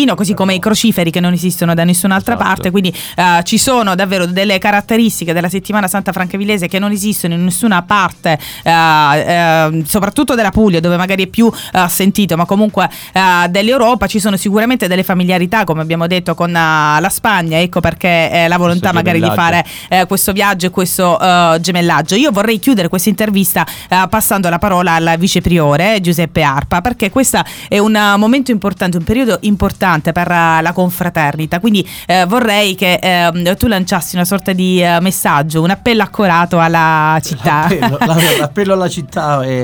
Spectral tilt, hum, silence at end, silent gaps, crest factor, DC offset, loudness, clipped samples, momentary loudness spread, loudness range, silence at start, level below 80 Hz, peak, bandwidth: -4.5 dB/octave; none; 0 s; none; 12 dB; under 0.1%; -12 LUFS; under 0.1%; 5 LU; 1 LU; 0 s; -38 dBFS; 0 dBFS; over 20 kHz